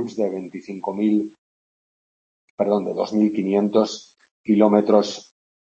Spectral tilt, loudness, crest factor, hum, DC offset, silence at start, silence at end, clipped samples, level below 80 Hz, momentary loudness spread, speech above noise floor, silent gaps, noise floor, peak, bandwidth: -6.5 dB/octave; -20 LUFS; 20 dB; none; under 0.1%; 0 s; 0.55 s; under 0.1%; -70 dBFS; 17 LU; over 70 dB; 1.38-2.58 s, 4.31-4.44 s; under -90 dBFS; -2 dBFS; 7.8 kHz